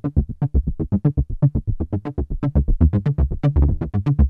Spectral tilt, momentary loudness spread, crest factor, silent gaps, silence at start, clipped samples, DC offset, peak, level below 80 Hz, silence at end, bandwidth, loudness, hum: -11.5 dB/octave; 7 LU; 16 dB; none; 0.05 s; under 0.1%; under 0.1%; -2 dBFS; -22 dBFS; 0 s; 3.8 kHz; -21 LUFS; none